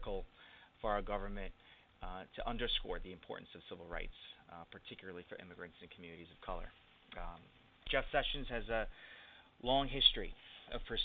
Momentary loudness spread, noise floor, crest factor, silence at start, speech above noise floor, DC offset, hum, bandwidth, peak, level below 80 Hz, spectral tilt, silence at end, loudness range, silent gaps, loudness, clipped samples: 19 LU; -62 dBFS; 26 dB; 0 s; 21 dB; under 0.1%; none; 4.7 kHz; -16 dBFS; -50 dBFS; -1 dB/octave; 0 s; 15 LU; none; -39 LUFS; under 0.1%